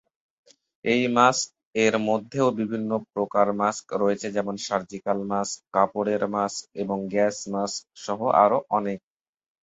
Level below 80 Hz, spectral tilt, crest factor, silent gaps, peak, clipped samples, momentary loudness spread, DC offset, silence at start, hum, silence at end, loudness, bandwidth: -66 dBFS; -4.5 dB/octave; 22 dB; 1.65-1.71 s; -4 dBFS; under 0.1%; 10 LU; under 0.1%; 0.85 s; none; 0.65 s; -25 LUFS; 8 kHz